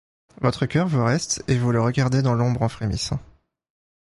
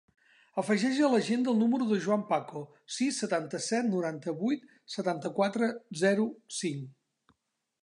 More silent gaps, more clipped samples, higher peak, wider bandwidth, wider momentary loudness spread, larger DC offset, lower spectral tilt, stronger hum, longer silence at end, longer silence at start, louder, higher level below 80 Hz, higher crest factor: neither; neither; first, -4 dBFS vs -14 dBFS; about the same, 11.5 kHz vs 11 kHz; second, 6 LU vs 11 LU; neither; about the same, -5.5 dB/octave vs -5 dB/octave; neither; about the same, 0.9 s vs 0.95 s; second, 0.4 s vs 0.55 s; first, -22 LUFS vs -30 LUFS; first, -44 dBFS vs -82 dBFS; about the same, 18 dB vs 16 dB